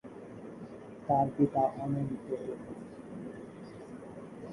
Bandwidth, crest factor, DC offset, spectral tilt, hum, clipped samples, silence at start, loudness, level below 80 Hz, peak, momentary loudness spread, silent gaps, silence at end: 11.5 kHz; 20 dB; under 0.1%; -9.5 dB/octave; none; under 0.1%; 0.05 s; -33 LUFS; -66 dBFS; -14 dBFS; 18 LU; none; 0 s